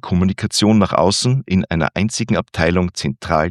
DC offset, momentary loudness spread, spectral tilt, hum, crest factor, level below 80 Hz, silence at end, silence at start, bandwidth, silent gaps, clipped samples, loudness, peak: under 0.1%; 6 LU; -5 dB/octave; none; 16 dB; -42 dBFS; 0 s; 0.05 s; 12.5 kHz; none; under 0.1%; -17 LUFS; 0 dBFS